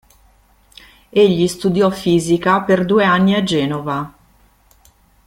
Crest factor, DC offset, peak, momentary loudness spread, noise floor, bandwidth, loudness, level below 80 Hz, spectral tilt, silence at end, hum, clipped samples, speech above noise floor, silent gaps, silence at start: 16 dB; under 0.1%; -2 dBFS; 9 LU; -53 dBFS; 15.5 kHz; -15 LUFS; -50 dBFS; -6 dB/octave; 1.15 s; none; under 0.1%; 38 dB; none; 1.15 s